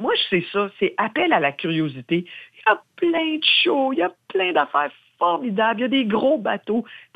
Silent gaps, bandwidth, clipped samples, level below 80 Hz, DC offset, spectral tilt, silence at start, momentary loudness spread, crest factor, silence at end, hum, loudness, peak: none; 5 kHz; under 0.1%; -68 dBFS; under 0.1%; -7 dB/octave; 0 s; 8 LU; 16 dB; 0.15 s; none; -21 LUFS; -4 dBFS